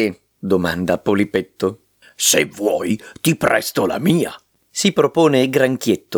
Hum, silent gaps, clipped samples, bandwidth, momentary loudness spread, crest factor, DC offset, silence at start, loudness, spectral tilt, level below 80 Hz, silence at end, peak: none; none; under 0.1%; over 20 kHz; 9 LU; 16 dB; under 0.1%; 0 s; -18 LUFS; -4 dB/octave; -56 dBFS; 0 s; -2 dBFS